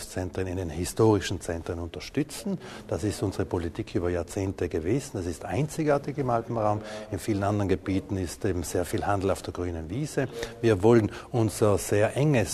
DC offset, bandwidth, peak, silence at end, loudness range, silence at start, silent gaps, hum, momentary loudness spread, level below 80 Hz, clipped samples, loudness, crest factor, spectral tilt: under 0.1%; 13.5 kHz; -8 dBFS; 0 s; 5 LU; 0 s; none; none; 10 LU; -48 dBFS; under 0.1%; -28 LUFS; 20 dB; -6 dB/octave